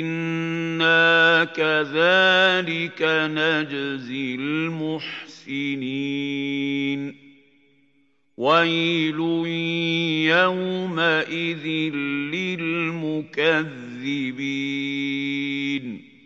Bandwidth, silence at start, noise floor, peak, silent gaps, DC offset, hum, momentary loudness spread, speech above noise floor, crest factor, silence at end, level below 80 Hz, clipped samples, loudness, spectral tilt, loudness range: 7.6 kHz; 0 s; -65 dBFS; -4 dBFS; none; under 0.1%; none; 12 LU; 43 dB; 18 dB; 0.25 s; -82 dBFS; under 0.1%; -22 LUFS; -5.5 dB/octave; 8 LU